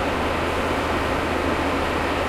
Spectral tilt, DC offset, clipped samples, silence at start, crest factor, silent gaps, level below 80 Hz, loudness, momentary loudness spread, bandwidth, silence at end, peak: -5 dB/octave; under 0.1%; under 0.1%; 0 s; 12 dB; none; -36 dBFS; -23 LUFS; 1 LU; 16 kHz; 0 s; -10 dBFS